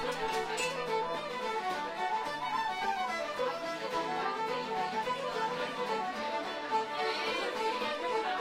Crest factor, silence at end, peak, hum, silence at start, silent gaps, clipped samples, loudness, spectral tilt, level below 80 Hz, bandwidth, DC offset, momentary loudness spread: 14 dB; 0 s; -20 dBFS; none; 0 s; none; under 0.1%; -34 LUFS; -3 dB/octave; -66 dBFS; 16 kHz; under 0.1%; 3 LU